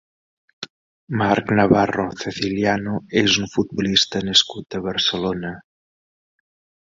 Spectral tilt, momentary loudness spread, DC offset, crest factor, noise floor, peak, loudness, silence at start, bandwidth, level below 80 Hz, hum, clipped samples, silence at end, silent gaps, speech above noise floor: -4 dB/octave; 16 LU; under 0.1%; 20 dB; under -90 dBFS; -2 dBFS; -19 LUFS; 0.6 s; 7.8 kHz; -50 dBFS; none; under 0.1%; 1.2 s; 0.70-1.07 s; over 70 dB